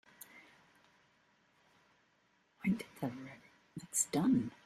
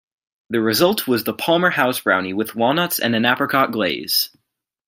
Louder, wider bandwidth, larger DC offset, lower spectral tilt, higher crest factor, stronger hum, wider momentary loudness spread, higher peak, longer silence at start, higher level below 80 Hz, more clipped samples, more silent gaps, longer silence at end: second, -36 LUFS vs -18 LUFS; about the same, 15 kHz vs 16.5 kHz; neither; about the same, -4.5 dB/octave vs -4 dB/octave; about the same, 22 dB vs 18 dB; neither; first, 23 LU vs 5 LU; second, -20 dBFS vs -2 dBFS; second, 0.35 s vs 0.5 s; second, -72 dBFS vs -64 dBFS; neither; neither; second, 0.15 s vs 0.6 s